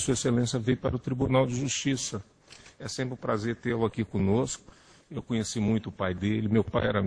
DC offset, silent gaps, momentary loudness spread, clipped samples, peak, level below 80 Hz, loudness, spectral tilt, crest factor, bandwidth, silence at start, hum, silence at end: under 0.1%; none; 9 LU; under 0.1%; -10 dBFS; -52 dBFS; -29 LUFS; -5.5 dB/octave; 18 dB; 10.5 kHz; 0 s; none; 0 s